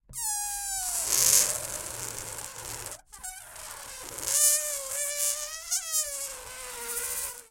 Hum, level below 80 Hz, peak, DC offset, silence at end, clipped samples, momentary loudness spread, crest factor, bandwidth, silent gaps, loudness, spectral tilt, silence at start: none; -56 dBFS; -2 dBFS; under 0.1%; 0.05 s; under 0.1%; 18 LU; 30 dB; 17 kHz; none; -27 LUFS; 1 dB/octave; 0.1 s